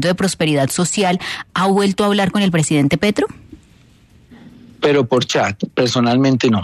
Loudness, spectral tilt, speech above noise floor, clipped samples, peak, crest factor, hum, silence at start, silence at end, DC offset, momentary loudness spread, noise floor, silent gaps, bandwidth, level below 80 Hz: -16 LUFS; -5 dB/octave; 33 dB; under 0.1%; -2 dBFS; 14 dB; none; 0 s; 0 s; under 0.1%; 5 LU; -49 dBFS; none; 13.5 kHz; -50 dBFS